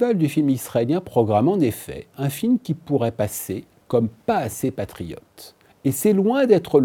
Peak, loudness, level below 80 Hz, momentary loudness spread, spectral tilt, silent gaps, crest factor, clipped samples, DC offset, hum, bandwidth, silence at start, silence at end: -4 dBFS; -21 LUFS; -56 dBFS; 13 LU; -6.5 dB/octave; none; 18 dB; under 0.1%; under 0.1%; none; 19 kHz; 0 s; 0 s